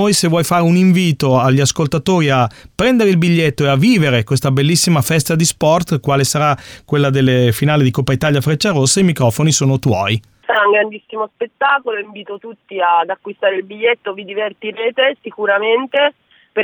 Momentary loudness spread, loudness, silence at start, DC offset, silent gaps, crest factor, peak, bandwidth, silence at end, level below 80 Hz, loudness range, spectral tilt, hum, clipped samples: 10 LU; -14 LUFS; 0 s; under 0.1%; none; 12 dB; -4 dBFS; over 20 kHz; 0 s; -46 dBFS; 5 LU; -5 dB/octave; none; under 0.1%